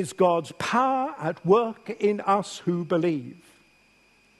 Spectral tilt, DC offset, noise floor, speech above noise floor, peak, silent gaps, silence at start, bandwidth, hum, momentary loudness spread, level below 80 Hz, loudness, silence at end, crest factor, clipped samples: -6 dB/octave; under 0.1%; -60 dBFS; 36 dB; -8 dBFS; none; 0 s; 12.5 kHz; none; 8 LU; -70 dBFS; -25 LUFS; 1.05 s; 18 dB; under 0.1%